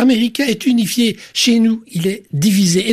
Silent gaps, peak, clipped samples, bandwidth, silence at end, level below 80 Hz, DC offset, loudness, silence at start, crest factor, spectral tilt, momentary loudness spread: none; -4 dBFS; under 0.1%; 15 kHz; 0 s; -58 dBFS; under 0.1%; -15 LUFS; 0 s; 12 dB; -4.5 dB/octave; 7 LU